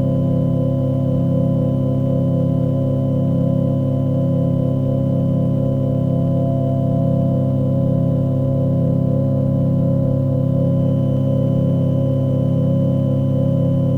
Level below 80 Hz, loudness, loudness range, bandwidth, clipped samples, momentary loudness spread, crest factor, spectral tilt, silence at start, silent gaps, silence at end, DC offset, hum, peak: -38 dBFS; -18 LUFS; 1 LU; 3.2 kHz; under 0.1%; 1 LU; 10 dB; -11.5 dB/octave; 0 s; none; 0 s; under 0.1%; none; -6 dBFS